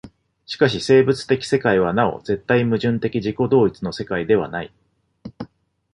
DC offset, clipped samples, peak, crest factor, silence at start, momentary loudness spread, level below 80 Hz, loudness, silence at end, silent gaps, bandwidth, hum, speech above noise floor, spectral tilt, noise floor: under 0.1%; under 0.1%; -2 dBFS; 18 dB; 0.05 s; 18 LU; -50 dBFS; -19 LUFS; 0.5 s; none; 11 kHz; none; 25 dB; -6.5 dB/octave; -44 dBFS